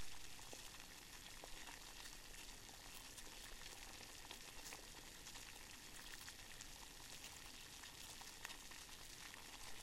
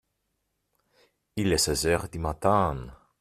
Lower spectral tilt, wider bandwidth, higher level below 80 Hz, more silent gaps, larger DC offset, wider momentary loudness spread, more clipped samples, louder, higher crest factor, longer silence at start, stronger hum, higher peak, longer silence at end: second, -1 dB/octave vs -4 dB/octave; about the same, 16 kHz vs 15 kHz; second, -66 dBFS vs -46 dBFS; neither; neither; second, 2 LU vs 15 LU; neither; second, -55 LUFS vs -26 LUFS; about the same, 26 dB vs 22 dB; second, 0 s vs 1.35 s; second, none vs 50 Hz at -50 dBFS; second, -28 dBFS vs -8 dBFS; second, 0 s vs 0.25 s